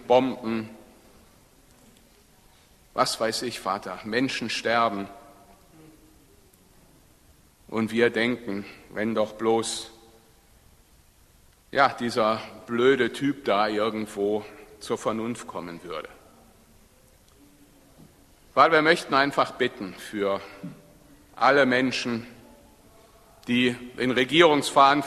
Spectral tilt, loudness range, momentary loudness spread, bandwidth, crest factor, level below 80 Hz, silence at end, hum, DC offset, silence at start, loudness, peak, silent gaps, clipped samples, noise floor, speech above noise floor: -4 dB/octave; 8 LU; 18 LU; 13.5 kHz; 24 dB; -60 dBFS; 0 s; none; under 0.1%; 0 s; -24 LUFS; -2 dBFS; none; under 0.1%; -57 dBFS; 33 dB